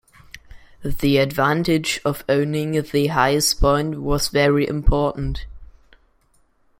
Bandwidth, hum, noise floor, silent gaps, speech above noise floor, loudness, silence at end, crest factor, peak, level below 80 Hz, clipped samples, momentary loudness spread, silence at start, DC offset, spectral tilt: 16.5 kHz; none; -60 dBFS; none; 41 dB; -20 LUFS; 1.15 s; 18 dB; -2 dBFS; -30 dBFS; under 0.1%; 7 LU; 0.35 s; under 0.1%; -5 dB/octave